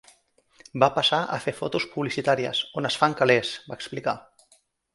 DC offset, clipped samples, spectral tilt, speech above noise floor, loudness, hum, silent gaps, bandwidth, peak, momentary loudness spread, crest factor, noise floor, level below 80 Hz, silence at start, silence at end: under 0.1%; under 0.1%; -4.5 dB/octave; 39 dB; -24 LUFS; none; none; 11.5 kHz; -2 dBFS; 13 LU; 24 dB; -63 dBFS; -64 dBFS; 0.75 s; 0.75 s